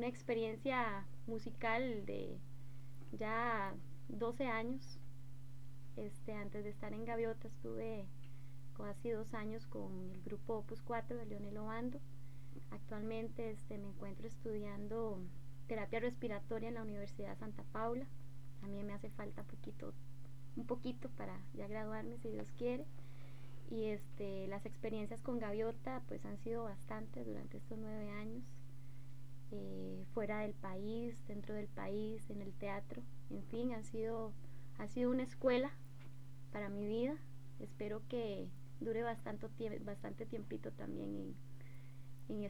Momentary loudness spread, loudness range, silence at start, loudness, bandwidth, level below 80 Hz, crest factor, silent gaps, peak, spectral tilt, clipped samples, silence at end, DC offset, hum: 16 LU; 6 LU; 0 s; -45 LUFS; over 20 kHz; -64 dBFS; 22 dB; none; -24 dBFS; -7 dB/octave; under 0.1%; 0 s; 0.6%; none